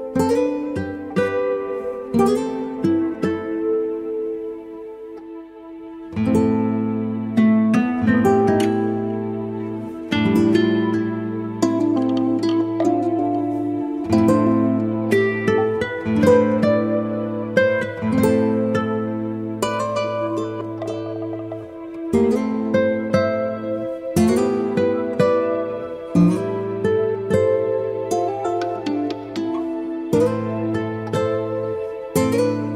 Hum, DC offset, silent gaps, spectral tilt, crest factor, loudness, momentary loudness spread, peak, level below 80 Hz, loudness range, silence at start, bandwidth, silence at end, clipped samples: none; under 0.1%; none; -7 dB/octave; 18 dB; -20 LUFS; 10 LU; -2 dBFS; -56 dBFS; 5 LU; 0 s; 16 kHz; 0 s; under 0.1%